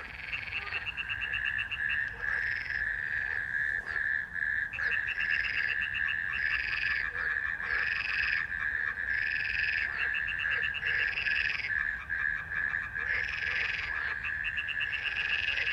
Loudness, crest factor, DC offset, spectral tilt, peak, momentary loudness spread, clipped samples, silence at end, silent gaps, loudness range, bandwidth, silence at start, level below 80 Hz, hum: -30 LUFS; 18 dB; under 0.1%; -2.5 dB/octave; -14 dBFS; 4 LU; under 0.1%; 0 s; none; 2 LU; 11 kHz; 0 s; -54 dBFS; none